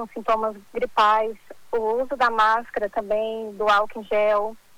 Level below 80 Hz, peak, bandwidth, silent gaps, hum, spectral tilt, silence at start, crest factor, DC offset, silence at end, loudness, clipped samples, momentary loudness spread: -54 dBFS; -8 dBFS; 19 kHz; none; none; -3.5 dB/octave; 0 s; 14 dB; under 0.1%; 0.2 s; -23 LUFS; under 0.1%; 10 LU